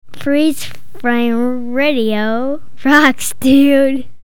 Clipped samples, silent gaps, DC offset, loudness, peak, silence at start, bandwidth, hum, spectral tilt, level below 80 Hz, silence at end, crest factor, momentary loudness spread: under 0.1%; none; 9%; -14 LUFS; 0 dBFS; 0 s; 17.5 kHz; none; -4 dB/octave; -48 dBFS; 0 s; 14 dB; 10 LU